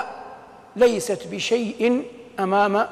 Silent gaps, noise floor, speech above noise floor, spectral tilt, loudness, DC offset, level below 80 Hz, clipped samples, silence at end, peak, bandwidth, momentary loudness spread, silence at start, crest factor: none; -43 dBFS; 22 dB; -4.5 dB/octave; -22 LUFS; under 0.1%; -60 dBFS; under 0.1%; 0 s; -6 dBFS; 14 kHz; 18 LU; 0 s; 16 dB